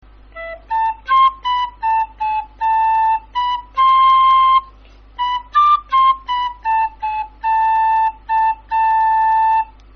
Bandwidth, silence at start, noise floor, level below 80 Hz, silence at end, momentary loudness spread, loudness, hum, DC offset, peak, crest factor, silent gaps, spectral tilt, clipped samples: 6.2 kHz; 0.35 s; -43 dBFS; -44 dBFS; 0.3 s; 10 LU; -16 LUFS; none; under 0.1%; -6 dBFS; 10 dB; none; 2 dB/octave; under 0.1%